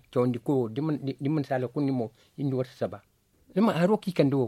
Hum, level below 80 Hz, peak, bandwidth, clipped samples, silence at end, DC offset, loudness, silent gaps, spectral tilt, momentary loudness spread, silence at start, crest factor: none; -68 dBFS; -8 dBFS; 14 kHz; under 0.1%; 0 s; under 0.1%; -28 LUFS; none; -8.5 dB/octave; 9 LU; 0.1 s; 20 dB